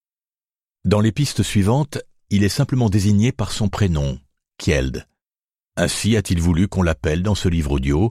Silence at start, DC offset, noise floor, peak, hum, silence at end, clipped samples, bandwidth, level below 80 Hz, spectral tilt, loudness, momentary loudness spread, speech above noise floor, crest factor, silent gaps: 0.85 s; under 0.1%; under -90 dBFS; -4 dBFS; none; 0 s; under 0.1%; 15 kHz; -32 dBFS; -6 dB/octave; -20 LUFS; 9 LU; over 72 dB; 16 dB; 5.44-5.48 s